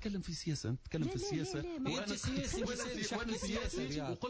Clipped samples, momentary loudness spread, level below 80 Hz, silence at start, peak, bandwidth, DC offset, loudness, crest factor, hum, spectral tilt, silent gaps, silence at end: under 0.1%; 2 LU; -52 dBFS; 0 s; -26 dBFS; 8 kHz; under 0.1%; -39 LUFS; 12 dB; none; -4.5 dB/octave; none; 0 s